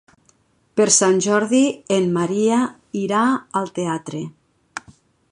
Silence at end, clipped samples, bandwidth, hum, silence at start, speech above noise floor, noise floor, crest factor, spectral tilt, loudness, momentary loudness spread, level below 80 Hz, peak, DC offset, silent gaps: 0.5 s; under 0.1%; 11 kHz; none; 0.75 s; 41 dB; -60 dBFS; 18 dB; -4 dB/octave; -19 LUFS; 20 LU; -64 dBFS; -2 dBFS; under 0.1%; none